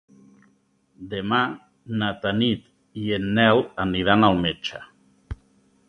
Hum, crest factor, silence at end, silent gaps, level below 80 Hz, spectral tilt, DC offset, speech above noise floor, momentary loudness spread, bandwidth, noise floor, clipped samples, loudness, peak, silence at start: none; 22 dB; 0.55 s; none; -48 dBFS; -7 dB/octave; under 0.1%; 42 dB; 23 LU; 6.6 kHz; -64 dBFS; under 0.1%; -22 LUFS; -2 dBFS; 1 s